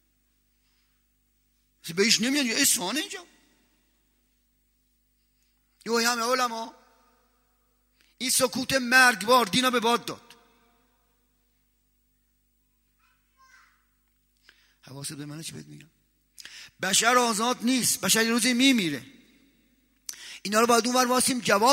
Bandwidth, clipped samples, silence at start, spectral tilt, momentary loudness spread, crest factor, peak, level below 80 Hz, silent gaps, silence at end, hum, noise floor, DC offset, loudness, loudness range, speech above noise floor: 16 kHz; under 0.1%; 1.85 s; -2 dB/octave; 21 LU; 24 dB; -4 dBFS; -68 dBFS; none; 0 s; 50 Hz at -65 dBFS; -70 dBFS; under 0.1%; -23 LUFS; 19 LU; 46 dB